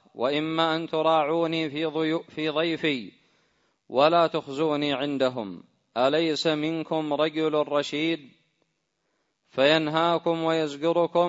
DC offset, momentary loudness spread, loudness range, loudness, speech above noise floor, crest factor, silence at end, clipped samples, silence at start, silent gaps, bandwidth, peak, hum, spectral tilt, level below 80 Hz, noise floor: under 0.1%; 7 LU; 2 LU; -25 LUFS; 51 dB; 20 dB; 0 s; under 0.1%; 0.15 s; none; 8 kHz; -6 dBFS; none; -5.5 dB/octave; -72 dBFS; -76 dBFS